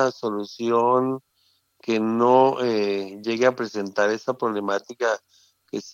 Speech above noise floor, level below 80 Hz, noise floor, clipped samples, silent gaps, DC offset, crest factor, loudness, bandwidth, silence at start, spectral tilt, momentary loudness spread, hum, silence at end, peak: 44 dB; -80 dBFS; -66 dBFS; under 0.1%; none; under 0.1%; 18 dB; -23 LUFS; 7.4 kHz; 0 s; -5.5 dB/octave; 11 LU; none; 0 s; -4 dBFS